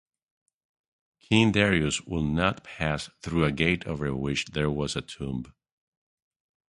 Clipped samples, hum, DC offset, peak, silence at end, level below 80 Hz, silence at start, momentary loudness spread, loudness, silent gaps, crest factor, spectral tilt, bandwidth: under 0.1%; none; under 0.1%; -6 dBFS; 1.25 s; -46 dBFS; 1.3 s; 12 LU; -27 LUFS; none; 22 dB; -5 dB/octave; 11.5 kHz